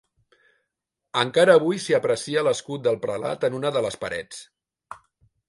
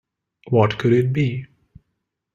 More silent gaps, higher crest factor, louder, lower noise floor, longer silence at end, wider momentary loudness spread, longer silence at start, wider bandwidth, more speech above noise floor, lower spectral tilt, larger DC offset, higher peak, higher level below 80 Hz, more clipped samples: neither; about the same, 20 dB vs 20 dB; second, -23 LUFS vs -19 LUFS; first, -83 dBFS vs -77 dBFS; second, 0.55 s vs 0.9 s; first, 24 LU vs 7 LU; first, 1.15 s vs 0.45 s; first, 11.5 kHz vs 7.4 kHz; about the same, 60 dB vs 58 dB; second, -4.5 dB/octave vs -8.5 dB/octave; neither; about the same, -4 dBFS vs -2 dBFS; second, -64 dBFS vs -54 dBFS; neither